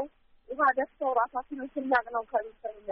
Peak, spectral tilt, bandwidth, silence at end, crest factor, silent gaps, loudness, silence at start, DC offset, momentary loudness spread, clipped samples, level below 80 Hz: -12 dBFS; -1.5 dB/octave; 4.2 kHz; 0 s; 18 dB; none; -29 LUFS; 0 s; under 0.1%; 14 LU; under 0.1%; -64 dBFS